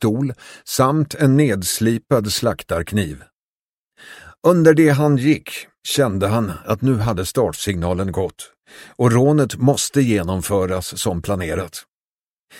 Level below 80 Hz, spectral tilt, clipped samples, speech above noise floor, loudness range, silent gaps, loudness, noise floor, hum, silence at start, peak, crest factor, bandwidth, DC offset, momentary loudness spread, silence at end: -44 dBFS; -5.5 dB/octave; under 0.1%; over 72 dB; 4 LU; 3.35-3.86 s, 5.78-5.82 s, 11.88-12.47 s; -18 LUFS; under -90 dBFS; none; 0 s; 0 dBFS; 18 dB; 16.5 kHz; under 0.1%; 12 LU; 0 s